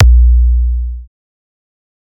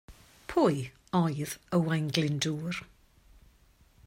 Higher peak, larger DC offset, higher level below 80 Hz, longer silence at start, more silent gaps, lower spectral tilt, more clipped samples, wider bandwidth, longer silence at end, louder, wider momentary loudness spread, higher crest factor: first, 0 dBFS vs -8 dBFS; neither; first, -12 dBFS vs -60 dBFS; about the same, 0 s vs 0.1 s; neither; first, -14 dB/octave vs -5.5 dB/octave; neither; second, 0.8 kHz vs 16 kHz; about the same, 1.15 s vs 1.25 s; first, -12 LUFS vs -30 LUFS; first, 17 LU vs 10 LU; second, 10 dB vs 24 dB